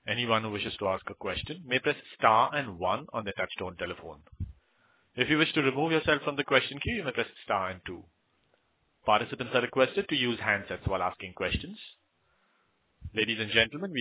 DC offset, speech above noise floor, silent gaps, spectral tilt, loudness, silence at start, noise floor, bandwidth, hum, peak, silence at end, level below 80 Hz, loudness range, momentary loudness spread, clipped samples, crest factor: under 0.1%; 42 dB; none; -2.5 dB/octave; -29 LUFS; 0.05 s; -72 dBFS; 4 kHz; none; -6 dBFS; 0 s; -52 dBFS; 4 LU; 17 LU; under 0.1%; 24 dB